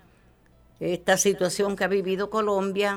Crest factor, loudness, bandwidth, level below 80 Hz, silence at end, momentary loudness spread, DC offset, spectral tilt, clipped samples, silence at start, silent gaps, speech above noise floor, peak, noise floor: 18 dB; -25 LUFS; 17 kHz; -58 dBFS; 0 s; 7 LU; under 0.1%; -3.5 dB/octave; under 0.1%; 0.8 s; none; 33 dB; -8 dBFS; -58 dBFS